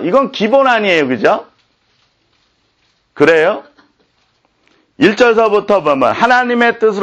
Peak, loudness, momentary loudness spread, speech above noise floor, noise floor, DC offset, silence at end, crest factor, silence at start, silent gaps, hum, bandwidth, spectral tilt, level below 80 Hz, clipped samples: 0 dBFS; -11 LUFS; 4 LU; 48 dB; -59 dBFS; under 0.1%; 0 s; 14 dB; 0 s; none; none; 8.8 kHz; -5 dB/octave; -54 dBFS; under 0.1%